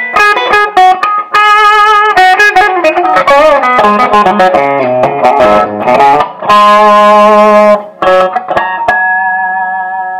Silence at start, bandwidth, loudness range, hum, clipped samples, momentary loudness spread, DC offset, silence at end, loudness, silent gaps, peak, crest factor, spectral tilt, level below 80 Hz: 0 s; 16.5 kHz; 2 LU; none; 4%; 7 LU; under 0.1%; 0 s; -6 LUFS; none; 0 dBFS; 6 dB; -4 dB/octave; -42 dBFS